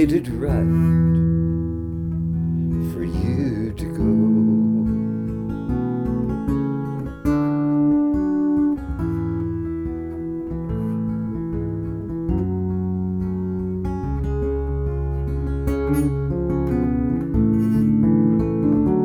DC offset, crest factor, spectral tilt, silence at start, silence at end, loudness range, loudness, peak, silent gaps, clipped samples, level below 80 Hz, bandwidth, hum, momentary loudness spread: under 0.1%; 14 dB; -10 dB/octave; 0 s; 0 s; 5 LU; -22 LUFS; -6 dBFS; none; under 0.1%; -32 dBFS; 12.5 kHz; none; 9 LU